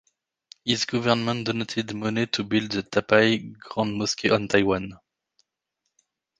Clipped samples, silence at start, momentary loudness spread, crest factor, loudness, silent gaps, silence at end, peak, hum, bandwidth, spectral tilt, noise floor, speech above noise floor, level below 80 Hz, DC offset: under 0.1%; 0.65 s; 9 LU; 24 dB; -24 LUFS; none; 1.45 s; -2 dBFS; none; 9.8 kHz; -4.5 dB/octave; -80 dBFS; 56 dB; -56 dBFS; under 0.1%